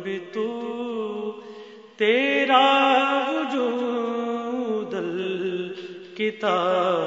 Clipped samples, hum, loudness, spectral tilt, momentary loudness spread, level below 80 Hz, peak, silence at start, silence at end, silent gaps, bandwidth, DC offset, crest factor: under 0.1%; none; -23 LUFS; -5 dB/octave; 16 LU; -80 dBFS; -4 dBFS; 0 s; 0 s; none; 7.8 kHz; under 0.1%; 20 dB